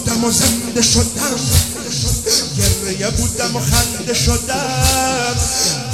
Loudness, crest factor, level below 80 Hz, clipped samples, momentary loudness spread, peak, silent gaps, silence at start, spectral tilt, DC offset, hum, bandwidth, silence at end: -15 LUFS; 16 dB; -26 dBFS; under 0.1%; 5 LU; 0 dBFS; none; 0 s; -3 dB/octave; 0.4%; none; 16.5 kHz; 0 s